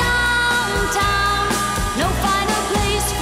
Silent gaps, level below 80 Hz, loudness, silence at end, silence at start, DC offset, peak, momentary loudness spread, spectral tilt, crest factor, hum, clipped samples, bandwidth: none; -28 dBFS; -18 LUFS; 0 s; 0 s; under 0.1%; -6 dBFS; 3 LU; -3 dB/octave; 12 dB; 60 Hz at -35 dBFS; under 0.1%; 16 kHz